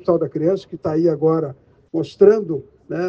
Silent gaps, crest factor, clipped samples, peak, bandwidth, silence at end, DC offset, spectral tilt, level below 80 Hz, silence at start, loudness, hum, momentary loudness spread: none; 18 dB; under 0.1%; -2 dBFS; 7 kHz; 0 s; under 0.1%; -9 dB/octave; -58 dBFS; 0.05 s; -19 LUFS; none; 14 LU